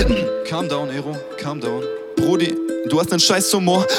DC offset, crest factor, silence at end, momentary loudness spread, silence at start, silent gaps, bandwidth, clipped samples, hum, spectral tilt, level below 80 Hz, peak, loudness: under 0.1%; 16 dB; 0 s; 12 LU; 0 s; none; 18 kHz; under 0.1%; none; -4 dB/octave; -34 dBFS; -2 dBFS; -19 LUFS